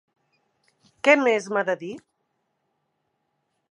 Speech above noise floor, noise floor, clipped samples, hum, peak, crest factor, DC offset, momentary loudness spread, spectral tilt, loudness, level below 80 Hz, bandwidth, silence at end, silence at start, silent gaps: 54 dB; -75 dBFS; under 0.1%; none; -4 dBFS; 24 dB; under 0.1%; 18 LU; -4 dB/octave; -22 LUFS; -80 dBFS; 11 kHz; 1.7 s; 1.05 s; none